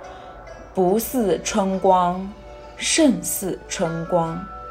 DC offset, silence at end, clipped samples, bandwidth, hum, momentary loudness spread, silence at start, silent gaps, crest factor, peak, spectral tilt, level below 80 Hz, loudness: under 0.1%; 0 s; under 0.1%; 16 kHz; none; 22 LU; 0 s; none; 20 dB; -2 dBFS; -4 dB/octave; -46 dBFS; -21 LUFS